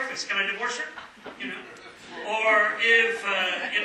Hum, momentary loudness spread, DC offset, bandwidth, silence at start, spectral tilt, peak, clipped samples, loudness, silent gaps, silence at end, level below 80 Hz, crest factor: none; 22 LU; under 0.1%; 13 kHz; 0 s; -1 dB/octave; -8 dBFS; under 0.1%; -23 LUFS; none; 0 s; -72 dBFS; 18 dB